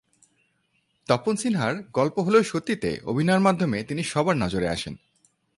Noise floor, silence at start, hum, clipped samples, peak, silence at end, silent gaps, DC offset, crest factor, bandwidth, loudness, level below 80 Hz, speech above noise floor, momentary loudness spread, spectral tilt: -70 dBFS; 1.1 s; none; under 0.1%; -6 dBFS; 0.6 s; none; under 0.1%; 20 dB; 11.5 kHz; -24 LUFS; -52 dBFS; 47 dB; 7 LU; -5.5 dB/octave